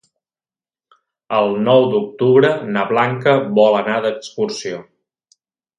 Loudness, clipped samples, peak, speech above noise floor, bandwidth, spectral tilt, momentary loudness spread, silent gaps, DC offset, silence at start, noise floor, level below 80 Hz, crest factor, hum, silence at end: -16 LUFS; under 0.1%; 0 dBFS; over 75 dB; 9.6 kHz; -6 dB/octave; 10 LU; none; under 0.1%; 1.3 s; under -90 dBFS; -64 dBFS; 18 dB; none; 0.95 s